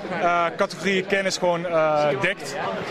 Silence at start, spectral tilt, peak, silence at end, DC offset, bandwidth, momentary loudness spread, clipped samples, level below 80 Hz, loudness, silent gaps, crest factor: 0 s; -4 dB/octave; -6 dBFS; 0 s; under 0.1%; 14.5 kHz; 5 LU; under 0.1%; -58 dBFS; -22 LUFS; none; 16 dB